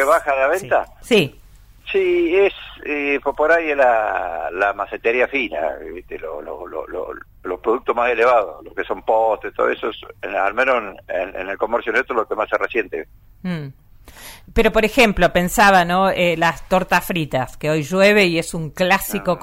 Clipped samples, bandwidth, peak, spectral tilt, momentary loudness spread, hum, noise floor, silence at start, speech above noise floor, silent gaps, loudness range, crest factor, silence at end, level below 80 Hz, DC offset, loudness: under 0.1%; 16 kHz; -2 dBFS; -4.5 dB/octave; 15 LU; none; -44 dBFS; 0 s; 26 dB; none; 7 LU; 16 dB; 0 s; -40 dBFS; under 0.1%; -18 LUFS